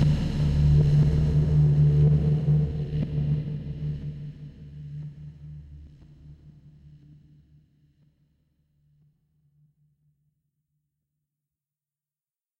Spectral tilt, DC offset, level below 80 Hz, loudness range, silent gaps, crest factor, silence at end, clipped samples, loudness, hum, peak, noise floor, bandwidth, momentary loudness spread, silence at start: -9.5 dB/octave; under 0.1%; -36 dBFS; 23 LU; none; 16 dB; 6.1 s; under 0.1%; -23 LUFS; none; -10 dBFS; under -90 dBFS; 5.6 kHz; 23 LU; 0 s